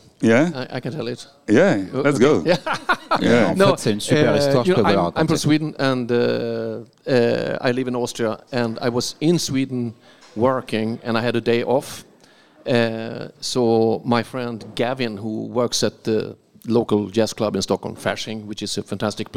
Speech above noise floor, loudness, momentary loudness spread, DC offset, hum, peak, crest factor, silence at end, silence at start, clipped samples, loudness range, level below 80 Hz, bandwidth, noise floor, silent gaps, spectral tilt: 32 dB; -20 LUFS; 12 LU; 0.5%; none; -2 dBFS; 18 dB; 0 s; 0.2 s; under 0.1%; 5 LU; -56 dBFS; 16 kHz; -52 dBFS; none; -5.5 dB/octave